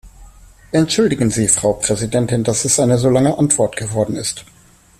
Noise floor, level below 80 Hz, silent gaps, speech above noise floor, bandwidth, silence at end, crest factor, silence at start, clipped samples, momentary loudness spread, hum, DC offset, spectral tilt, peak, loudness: -42 dBFS; -44 dBFS; none; 27 dB; 14.5 kHz; 0.55 s; 16 dB; 0.05 s; under 0.1%; 6 LU; none; under 0.1%; -4.5 dB/octave; 0 dBFS; -16 LUFS